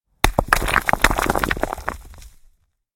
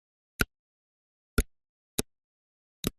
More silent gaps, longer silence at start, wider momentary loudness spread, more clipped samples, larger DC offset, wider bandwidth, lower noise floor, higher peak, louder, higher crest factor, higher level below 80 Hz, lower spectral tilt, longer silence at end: second, none vs 0.59-1.37 s, 1.69-1.98 s, 2.24-2.83 s; second, 0.25 s vs 0.4 s; about the same, 12 LU vs 13 LU; neither; neither; first, 17 kHz vs 13 kHz; second, -57 dBFS vs under -90 dBFS; first, 0 dBFS vs -6 dBFS; first, -20 LUFS vs -34 LUFS; second, 22 dB vs 30 dB; first, -28 dBFS vs -42 dBFS; about the same, -3.5 dB/octave vs -3.5 dB/octave; first, 0.65 s vs 0.1 s